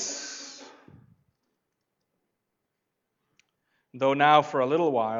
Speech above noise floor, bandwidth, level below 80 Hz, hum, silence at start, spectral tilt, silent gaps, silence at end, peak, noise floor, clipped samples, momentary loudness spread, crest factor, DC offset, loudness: 59 dB; 7.8 kHz; -84 dBFS; none; 0 s; -4 dB/octave; none; 0 s; -6 dBFS; -82 dBFS; under 0.1%; 21 LU; 22 dB; under 0.1%; -23 LUFS